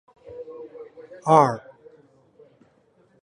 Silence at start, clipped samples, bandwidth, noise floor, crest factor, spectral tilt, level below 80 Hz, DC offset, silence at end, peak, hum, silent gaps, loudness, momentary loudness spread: 0.3 s; under 0.1%; 11 kHz; -61 dBFS; 24 dB; -7 dB/octave; -68 dBFS; under 0.1%; 1.65 s; -2 dBFS; none; none; -19 LUFS; 26 LU